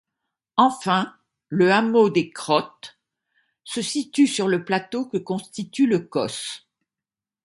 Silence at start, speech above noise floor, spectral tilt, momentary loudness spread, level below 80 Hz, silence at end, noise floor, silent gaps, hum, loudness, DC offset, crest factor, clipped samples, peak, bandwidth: 0.55 s; 69 dB; -5 dB/octave; 14 LU; -70 dBFS; 0.85 s; -90 dBFS; none; none; -22 LUFS; under 0.1%; 20 dB; under 0.1%; -4 dBFS; 11.5 kHz